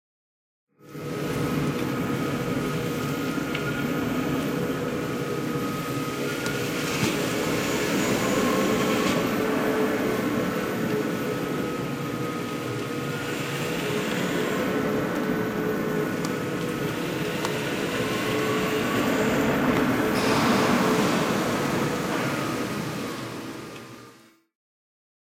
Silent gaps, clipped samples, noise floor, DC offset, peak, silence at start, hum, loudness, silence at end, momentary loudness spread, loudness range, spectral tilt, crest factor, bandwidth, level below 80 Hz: none; under 0.1%; -53 dBFS; under 0.1%; -10 dBFS; 0.85 s; none; -26 LUFS; 1.2 s; 7 LU; 5 LU; -5 dB/octave; 16 dB; 16.5 kHz; -52 dBFS